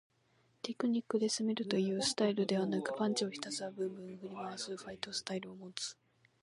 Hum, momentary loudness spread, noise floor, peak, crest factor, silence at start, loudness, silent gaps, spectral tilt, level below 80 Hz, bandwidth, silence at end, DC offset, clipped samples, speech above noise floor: none; 11 LU; -73 dBFS; -14 dBFS; 22 dB; 0.65 s; -37 LUFS; none; -4 dB/octave; -80 dBFS; 11.5 kHz; 0.5 s; under 0.1%; under 0.1%; 36 dB